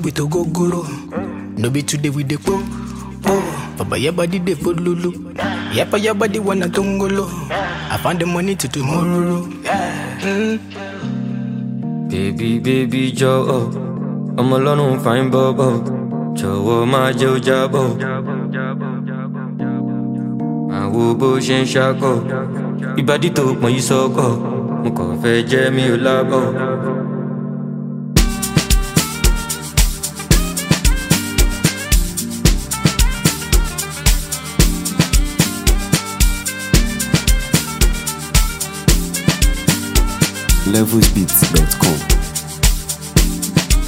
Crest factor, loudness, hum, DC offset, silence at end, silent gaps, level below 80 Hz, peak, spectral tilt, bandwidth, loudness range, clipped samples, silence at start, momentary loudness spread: 16 dB; -17 LUFS; none; under 0.1%; 0 s; none; -22 dBFS; 0 dBFS; -4.5 dB/octave; 16.5 kHz; 5 LU; under 0.1%; 0 s; 8 LU